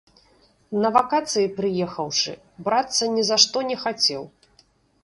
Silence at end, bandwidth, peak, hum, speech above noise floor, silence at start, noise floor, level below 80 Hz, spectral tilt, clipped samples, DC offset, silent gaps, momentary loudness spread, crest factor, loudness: 0.75 s; 11.5 kHz; 0 dBFS; none; 37 dB; 0.7 s; -60 dBFS; -64 dBFS; -2.5 dB/octave; under 0.1%; under 0.1%; none; 11 LU; 24 dB; -21 LUFS